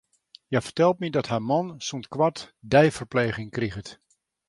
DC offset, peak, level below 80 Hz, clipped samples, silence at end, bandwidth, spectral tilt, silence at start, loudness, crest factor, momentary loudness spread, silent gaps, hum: under 0.1%; -4 dBFS; -56 dBFS; under 0.1%; 0.55 s; 11.5 kHz; -5.5 dB/octave; 0.5 s; -25 LUFS; 22 dB; 13 LU; none; none